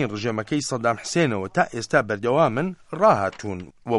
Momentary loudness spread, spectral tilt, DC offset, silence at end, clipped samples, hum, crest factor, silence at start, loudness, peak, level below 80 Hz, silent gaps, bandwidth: 10 LU; -5.5 dB/octave; under 0.1%; 0 s; under 0.1%; none; 18 dB; 0 s; -22 LUFS; -4 dBFS; -58 dBFS; none; 11.5 kHz